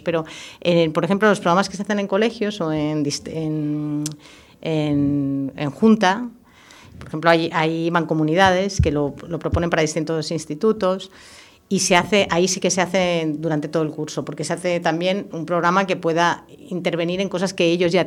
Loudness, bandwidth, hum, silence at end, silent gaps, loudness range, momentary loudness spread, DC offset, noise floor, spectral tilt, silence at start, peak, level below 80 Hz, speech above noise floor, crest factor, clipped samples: -20 LUFS; 15.5 kHz; none; 0 s; none; 3 LU; 10 LU; under 0.1%; -47 dBFS; -5 dB/octave; 0.05 s; 0 dBFS; -42 dBFS; 27 dB; 20 dB; under 0.1%